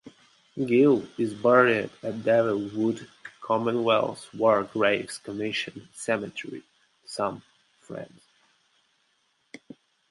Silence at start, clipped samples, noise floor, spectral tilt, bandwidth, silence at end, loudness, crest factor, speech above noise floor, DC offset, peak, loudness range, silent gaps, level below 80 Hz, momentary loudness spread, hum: 0.05 s; under 0.1%; -70 dBFS; -5.5 dB/octave; 11.5 kHz; 2.05 s; -25 LUFS; 22 dB; 45 dB; under 0.1%; -6 dBFS; 15 LU; none; -70 dBFS; 21 LU; none